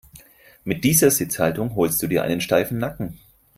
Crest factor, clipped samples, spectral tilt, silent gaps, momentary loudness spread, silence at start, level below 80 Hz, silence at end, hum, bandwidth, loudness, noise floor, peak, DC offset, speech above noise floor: 20 dB; under 0.1%; -4.5 dB/octave; none; 14 LU; 0.15 s; -50 dBFS; 0.4 s; none; 16 kHz; -20 LUFS; -49 dBFS; -2 dBFS; under 0.1%; 28 dB